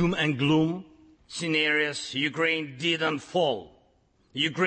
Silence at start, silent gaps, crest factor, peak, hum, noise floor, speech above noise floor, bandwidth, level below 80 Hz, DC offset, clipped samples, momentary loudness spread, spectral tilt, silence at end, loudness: 0 s; none; 16 dB; -12 dBFS; none; -65 dBFS; 39 dB; 8.8 kHz; -58 dBFS; under 0.1%; under 0.1%; 11 LU; -5 dB/octave; 0 s; -26 LUFS